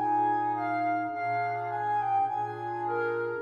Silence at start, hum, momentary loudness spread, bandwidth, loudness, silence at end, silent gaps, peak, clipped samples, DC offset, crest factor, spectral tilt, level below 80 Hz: 0 s; none; 5 LU; 6.8 kHz; -30 LUFS; 0 s; none; -18 dBFS; under 0.1%; under 0.1%; 12 dB; -8 dB/octave; -80 dBFS